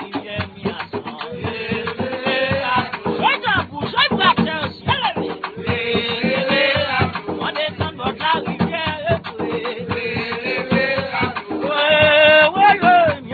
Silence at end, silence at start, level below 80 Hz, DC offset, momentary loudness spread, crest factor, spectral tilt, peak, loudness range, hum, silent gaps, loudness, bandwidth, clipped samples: 0 s; 0 s; -48 dBFS; under 0.1%; 13 LU; 18 dB; -7.5 dB/octave; 0 dBFS; 6 LU; none; none; -18 LUFS; 4.9 kHz; under 0.1%